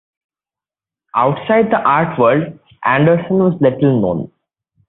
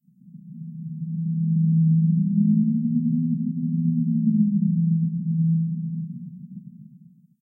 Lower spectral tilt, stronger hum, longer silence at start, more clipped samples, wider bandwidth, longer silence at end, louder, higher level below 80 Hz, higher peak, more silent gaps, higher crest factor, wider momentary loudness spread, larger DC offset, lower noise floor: second, -12.5 dB/octave vs -17 dB/octave; neither; first, 1.15 s vs 0.25 s; neither; first, 4.1 kHz vs 0.3 kHz; about the same, 0.65 s vs 0.6 s; first, -14 LUFS vs -22 LUFS; first, -52 dBFS vs -74 dBFS; first, -2 dBFS vs -10 dBFS; neither; about the same, 14 dB vs 12 dB; second, 9 LU vs 18 LU; neither; first, under -90 dBFS vs -51 dBFS